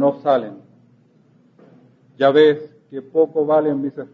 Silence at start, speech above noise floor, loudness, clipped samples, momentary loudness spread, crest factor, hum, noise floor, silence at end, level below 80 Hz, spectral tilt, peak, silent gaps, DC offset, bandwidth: 0 s; 37 dB; -17 LUFS; under 0.1%; 19 LU; 18 dB; none; -55 dBFS; 0.1 s; -72 dBFS; -8 dB/octave; -2 dBFS; none; under 0.1%; 5 kHz